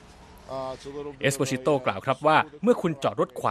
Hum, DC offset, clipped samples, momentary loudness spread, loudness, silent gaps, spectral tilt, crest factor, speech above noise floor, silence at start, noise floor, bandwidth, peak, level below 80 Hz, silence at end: none; under 0.1%; under 0.1%; 14 LU; -25 LUFS; none; -5 dB/octave; 20 dB; 23 dB; 0.2 s; -48 dBFS; 14 kHz; -6 dBFS; -58 dBFS; 0 s